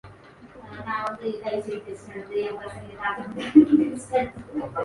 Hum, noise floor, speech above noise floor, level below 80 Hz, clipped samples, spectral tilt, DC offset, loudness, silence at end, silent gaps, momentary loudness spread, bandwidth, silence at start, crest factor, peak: none; -48 dBFS; 23 dB; -56 dBFS; under 0.1%; -6.5 dB/octave; under 0.1%; -25 LUFS; 0 s; none; 20 LU; 11.5 kHz; 0.05 s; 22 dB; -2 dBFS